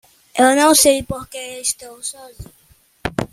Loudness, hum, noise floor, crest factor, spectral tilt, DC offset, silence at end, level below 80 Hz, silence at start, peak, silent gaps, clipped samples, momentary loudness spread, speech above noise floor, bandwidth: -16 LUFS; none; -54 dBFS; 18 dB; -2.5 dB/octave; under 0.1%; 0.05 s; -46 dBFS; 0.35 s; 0 dBFS; none; under 0.1%; 18 LU; 37 dB; 16 kHz